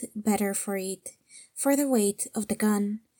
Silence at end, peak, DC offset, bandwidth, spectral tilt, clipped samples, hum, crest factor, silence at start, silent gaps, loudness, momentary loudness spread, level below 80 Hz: 0.2 s; -12 dBFS; under 0.1%; 18 kHz; -4.5 dB/octave; under 0.1%; none; 16 dB; 0 s; none; -27 LUFS; 13 LU; -68 dBFS